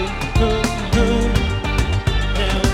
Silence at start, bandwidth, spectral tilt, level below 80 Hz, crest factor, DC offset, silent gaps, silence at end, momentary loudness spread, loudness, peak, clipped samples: 0 s; 15 kHz; -5.5 dB/octave; -22 dBFS; 14 dB; under 0.1%; none; 0 s; 3 LU; -19 LUFS; -2 dBFS; under 0.1%